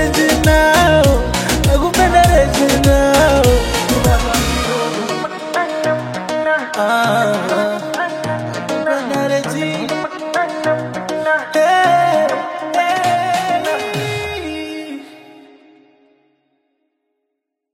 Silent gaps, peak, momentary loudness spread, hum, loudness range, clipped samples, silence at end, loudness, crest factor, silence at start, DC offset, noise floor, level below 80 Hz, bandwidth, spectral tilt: none; 0 dBFS; 10 LU; none; 9 LU; under 0.1%; 2.4 s; -15 LUFS; 16 dB; 0 s; under 0.1%; -76 dBFS; -26 dBFS; 16.5 kHz; -4.5 dB/octave